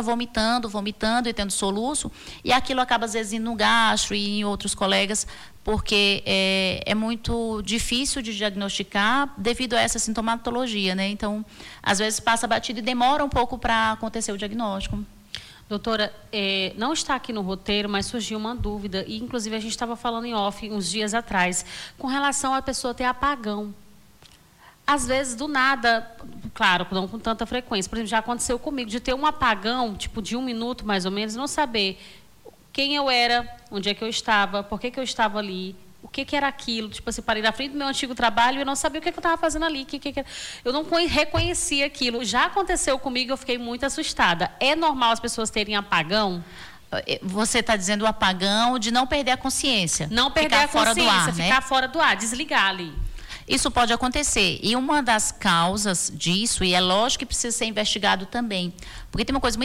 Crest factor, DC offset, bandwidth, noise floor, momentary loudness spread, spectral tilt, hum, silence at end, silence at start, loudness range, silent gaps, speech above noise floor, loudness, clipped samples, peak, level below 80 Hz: 16 dB; under 0.1%; 17 kHz; -53 dBFS; 10 LU; -2.5 dB/octave; none; 0 s; 0 s; 6 LU; none; 29 dB; -23 LUFS; under 0.1%; -8 dBFS; -42 dBFS